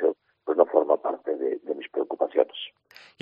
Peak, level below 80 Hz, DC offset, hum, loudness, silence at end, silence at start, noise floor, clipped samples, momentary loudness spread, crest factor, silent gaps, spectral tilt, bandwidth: -4 dBFS; -82 dBFS; under 0.1%; none; -26 LUFS; 0.55 s; 0 s; -54 dBFS; under 0.1%; 13 LU; 22 dB; none; -6 dB/octave; 5.4 kHz